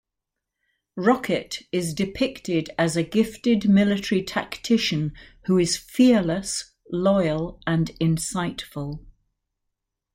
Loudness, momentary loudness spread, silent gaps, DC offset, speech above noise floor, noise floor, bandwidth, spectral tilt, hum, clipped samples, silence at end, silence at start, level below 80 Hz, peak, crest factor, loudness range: -23 LUFS; 13 LU; none; under 0.1%; 61 dB; -84 dBFS; 16 kHz; -5.5 dB/octave; none; under 0.1%; 1.05 s; 0.95 s; -50 dBFS; -6 dBFS; 18 dB; 4 LU